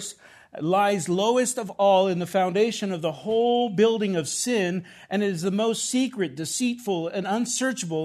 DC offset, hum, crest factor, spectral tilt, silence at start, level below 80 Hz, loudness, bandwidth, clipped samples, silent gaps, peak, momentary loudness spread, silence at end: under 0.1%; none; 16 dB; -4 dB/octave; 0 s; -72 dBFS; -24 LUFS; 13.5 kHz; under 0.1%; none; -8 dBFS; 7 LU; 0 s